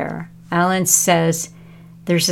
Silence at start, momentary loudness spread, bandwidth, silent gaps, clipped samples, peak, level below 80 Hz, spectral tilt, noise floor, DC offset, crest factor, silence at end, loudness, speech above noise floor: 0 s; 18 LU; 17 kHz; none; under 0.1%; 0 dBFS; -56 dBFS; -3.5 dB/octave; -41 dBFS; under 0.1%; 18 dB; 0 s; -17 LUFS; 25 dB